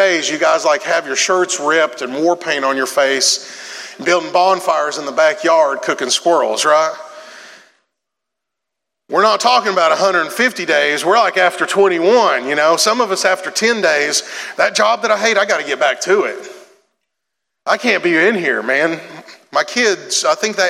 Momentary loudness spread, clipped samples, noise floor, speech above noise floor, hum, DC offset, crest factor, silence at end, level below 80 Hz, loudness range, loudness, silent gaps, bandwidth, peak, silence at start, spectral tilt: 7 LU; under 0.1%; -80 dBFS; 66 dB; none; under 0.1%; 14 dB; 0 s; -78 dBFS; 4 LU; -14 LUFS; none; 15.5 kHz; 0 dBFS; 0 s; -1.5 dB/octave